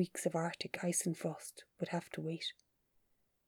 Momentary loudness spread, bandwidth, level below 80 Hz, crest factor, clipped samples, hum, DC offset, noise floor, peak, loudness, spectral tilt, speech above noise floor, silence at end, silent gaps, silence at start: 9 LU; 19.5 kHz; -82 dBFS; 20 dB; under 0.1%; none; under 0.1%; -77 dBFS; -20 dBFS; -39 LUFS; -4 dB/octave; 38 dB; 0.95 s; none; 0 s